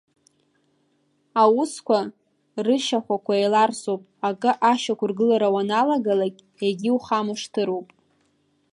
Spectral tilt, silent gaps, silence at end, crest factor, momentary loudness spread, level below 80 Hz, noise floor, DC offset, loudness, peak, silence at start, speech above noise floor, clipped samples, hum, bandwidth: -5 dB/octave; none; 0.9 s; 18 dB; 9 LU; -74 dBFS; -67 dBFS; under 0.1%; -22 LUFS; -6 dBFS; 1.35 s; 45 dB; under 0.1%; none; 11.5 kHz